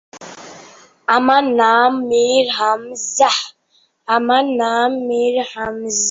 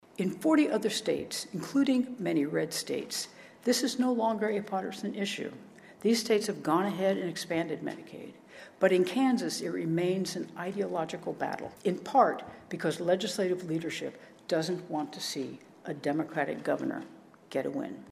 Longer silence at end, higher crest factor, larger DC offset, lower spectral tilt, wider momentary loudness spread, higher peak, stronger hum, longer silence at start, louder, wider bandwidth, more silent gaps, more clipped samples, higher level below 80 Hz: about the same, 0 s vs 0 s; about the same, 16 dB vs 20 dB; neither; second, -1.5 dB/octave vs -4.5 dB/octave; first, 17 LU vs 14 LU; first, -2 dBFS vs -10 dBFS; neither; about the same, 0.15 s vs 0.2 s; first, -16 LUFS vs -31 LUFS; second, 8 kHz vs 15 kHz; neither; neither; first, -60 dBFS vs -76 dBFS